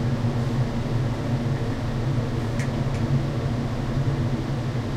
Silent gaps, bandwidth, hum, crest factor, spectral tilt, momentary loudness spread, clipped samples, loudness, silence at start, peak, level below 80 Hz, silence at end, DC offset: none; 12 kHz; none; 12 dB; -7.5 dB/octave; 2 LU; under 0.1%; -26 LUFS; 0 s; -12 dBFS; -36 dBFS; 0 s; under 0.1%